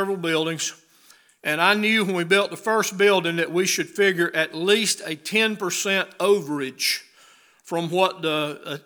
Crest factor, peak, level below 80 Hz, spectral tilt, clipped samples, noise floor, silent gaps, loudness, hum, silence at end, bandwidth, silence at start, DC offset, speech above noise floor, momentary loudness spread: 20 dB; -2 dBFS; -84 dBFS; -3 dB/octave; under 0.1%; -55 dBFS; none; -22 LUFS; none; 0.05 s; over 20 kHz; 0 s; under 0.1%; 33 dB; 8 LU